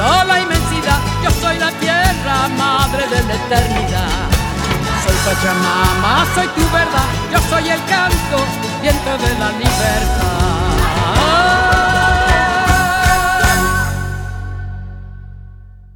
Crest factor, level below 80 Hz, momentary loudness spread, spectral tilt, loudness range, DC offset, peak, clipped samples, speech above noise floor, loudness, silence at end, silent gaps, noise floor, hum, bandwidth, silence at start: 14 dB; -22 dBFS; 6 LU; -4 dB/octave; 3 LU; under 0.1%; 0 dBFS; under 0.1%; 22 dB; -14 LUFS; 0.1 s; none; -36 dBFS; none; over 20 kHz; 0 s